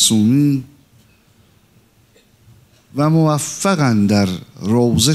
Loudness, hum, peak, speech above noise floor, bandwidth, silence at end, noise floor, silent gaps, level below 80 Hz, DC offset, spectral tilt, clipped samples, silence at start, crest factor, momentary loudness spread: -16 LUFS; none; 0 dBFS; 38 dB; 15.5 kHz; 0 s; -53 dBFS; none; -52 dBFS; under 0.1%; -5 dB/octave; under 0.1%; 0 s; 16 dB; 9 LU